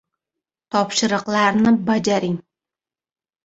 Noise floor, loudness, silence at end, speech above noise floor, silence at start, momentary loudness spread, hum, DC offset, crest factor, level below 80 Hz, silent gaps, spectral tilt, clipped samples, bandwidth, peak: -90 dBFS; -19 LUFS; 1.05 s; 72 dB; 0.75 s; 8 LU; none; under 0.1%; 18 dB; -58 dBFS; none; -4.5 dB/octave; under 0.1%; 8 kHz; -2 dBFS